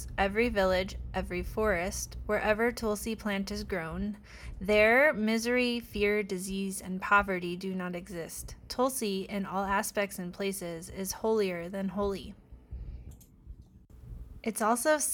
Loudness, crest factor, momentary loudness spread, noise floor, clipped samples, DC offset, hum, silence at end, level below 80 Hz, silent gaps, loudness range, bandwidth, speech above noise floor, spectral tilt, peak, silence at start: -30 LUFS; 20 dB; 14 LU; -53 dBFS; under 0.1%; under 0.1%; none; 0 s; -48 dBFS; none; 8 LU; 19 kHz; 23 dB; -4 dB/octave; -10 dBFS; 0 s